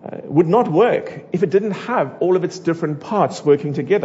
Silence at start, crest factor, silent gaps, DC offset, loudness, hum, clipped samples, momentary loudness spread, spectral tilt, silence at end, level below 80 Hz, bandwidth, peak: 0 s; 16 dB; none; under 0.1%; -18 LUFS; none; under 0.1%; 7 LU; -7.5 dB/octave; 0 s; -66 dBFS; 8 kHz; -2 dBFS